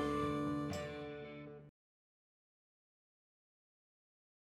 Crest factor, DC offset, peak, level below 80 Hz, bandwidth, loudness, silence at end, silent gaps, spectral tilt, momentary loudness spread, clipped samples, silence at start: 20 dB; under 0.1%; -26 dBFS; -66 dBFS; 14 kHz; -42 LUFS; 2.75 s; none; -6.5 dB/octave; 16 LU; under 0.1%; 0 s